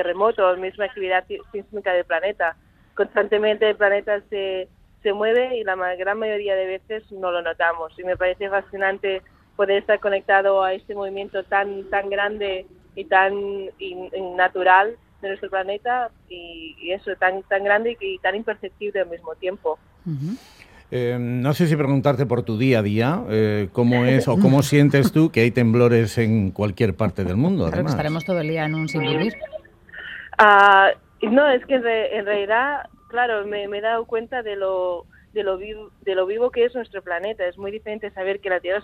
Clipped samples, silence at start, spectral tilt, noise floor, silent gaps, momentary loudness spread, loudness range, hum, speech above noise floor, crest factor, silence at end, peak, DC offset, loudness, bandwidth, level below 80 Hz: under 0.1%; 0 s; -6.5 dB/octave; -41 dBFS; none; 14 LU; 7 LU; none; 20 dB; 20 dB; 0 s; 0 dBFS; under 0.1%; -21 LUFS; 16 kHz; -54 dBFS